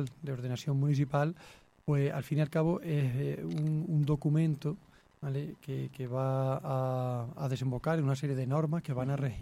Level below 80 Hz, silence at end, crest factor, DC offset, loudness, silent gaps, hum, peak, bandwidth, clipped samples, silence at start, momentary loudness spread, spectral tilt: -62 dBFS; 0 s; 16 dB; under 0.1%; -33 LUFS; none; none; -16 dBFS; 13 kHz; under 0.1%; 0 s; 9 LU; -8.5 dB/octave